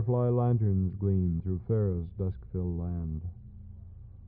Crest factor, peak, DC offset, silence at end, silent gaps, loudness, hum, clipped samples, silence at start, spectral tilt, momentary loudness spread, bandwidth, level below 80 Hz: 12 dB; -18 dBFS; under 0.1%; 0 s; none; -30 LUFS; none; under 0.1%; 0 s; -13.5 dB/octave; 22 LU; 2.4 kHz; -46 dBFS